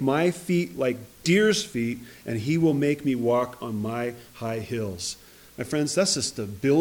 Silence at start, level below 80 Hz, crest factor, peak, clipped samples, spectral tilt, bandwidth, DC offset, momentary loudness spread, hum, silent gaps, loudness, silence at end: 0 s; -60 dBFS; 16 dB; -10 dBFS; under 0.1%; -5 dB/octave; 19.5 kHz; under 0.1%; 11 LU; none; none; -26 LUFS; 0 s